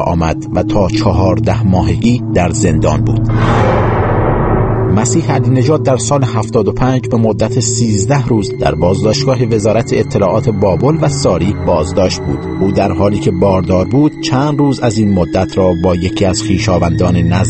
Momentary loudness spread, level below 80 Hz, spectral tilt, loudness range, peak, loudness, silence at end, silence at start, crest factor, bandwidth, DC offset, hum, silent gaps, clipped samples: 2 LU; -28 dBFS; -6.5 dB/octave; 1 LU; 0 dBFS; -12 LUFS; 0 s; 0 s; 12 dB; 8.8 kHz; under 0.1%; none; none; under 0.1%